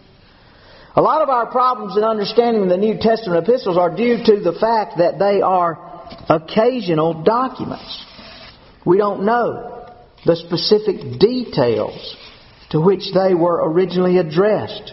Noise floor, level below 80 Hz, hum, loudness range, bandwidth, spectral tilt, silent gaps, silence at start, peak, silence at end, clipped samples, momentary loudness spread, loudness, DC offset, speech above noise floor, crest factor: -47 dBFS; -52 dBFS; none; 3 LU; 6 kHz; -5 dB/octave; none; 0.95 s; 0 dBFS; 0 s; under 0.1%; 15 LU; -17 LUFS; under 0.1%; 31 dB; 18 dB